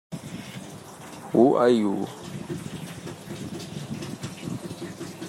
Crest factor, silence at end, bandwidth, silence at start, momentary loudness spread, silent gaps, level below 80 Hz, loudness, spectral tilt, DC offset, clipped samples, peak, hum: 22 dB; 0 s; 16 kHz; 0.1 s; 19 LU; none; -64 dBFS; -27 LUFS; -6 dB/octave; under 0.1%; under 0.1%; -6 dBFS; none